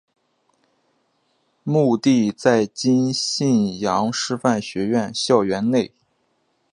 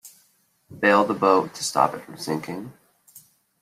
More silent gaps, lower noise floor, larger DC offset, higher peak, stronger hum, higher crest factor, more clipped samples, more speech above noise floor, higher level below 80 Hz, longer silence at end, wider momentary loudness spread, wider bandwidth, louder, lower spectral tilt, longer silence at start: neither; about the same, -67 dBFS vs -64 dBFS; neither; about the same, -2 dBFS vs -4 dBFS; neither; about the same, 20 dB vs 22 dB; neither; first, 48 dB vs 42 dB; first, -60 dBFS vs -68 dBFS; about the same, 0.85 s vs 0.9 s; second, 5 LU vs 16 LU; second, 11 kHz vs 15.5 kHz; about the same, -20 LUFS vs -22 LUFS; about the same, -5 dB/octave vs -4 dB/octave; first, 1.65 s vs 0.05 s